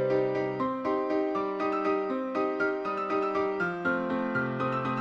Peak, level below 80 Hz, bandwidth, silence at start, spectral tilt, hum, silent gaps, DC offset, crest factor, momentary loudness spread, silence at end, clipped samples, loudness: -16 dBFS; -66 dBFS; 7.2 kHz; 0 s; -7.5 dB/octave; none; none; under 0.1%; 12 dB; 2 LU; 0 s; under 0.1%; -29 LUFS